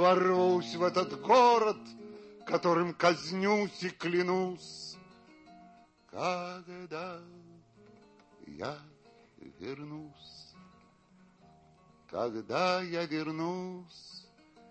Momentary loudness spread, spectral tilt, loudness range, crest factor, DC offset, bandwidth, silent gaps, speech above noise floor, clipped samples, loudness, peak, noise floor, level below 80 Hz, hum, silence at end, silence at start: 23 LU; -5.5 dB/octave; 18 LU; 22 dB; under 0.1%; 8.6 kHz; none; 32 dB; under 0.1%; -31 LUFS; -12 dBFS; -63 dBFS; -76 dBFS; none; 0.5 s; 0 s